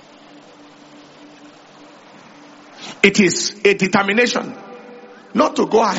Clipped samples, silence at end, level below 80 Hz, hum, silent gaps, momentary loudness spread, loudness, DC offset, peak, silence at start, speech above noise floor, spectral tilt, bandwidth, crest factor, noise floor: under 0.1%; 0 s; -60 dBFS; none; none; 22 LU; -16 LUFS; under 0.1%; 0 dBFS; 2.75 s; 28 dB; -3 dB/octave; 8 kHz; 20 dB; -44 dBFS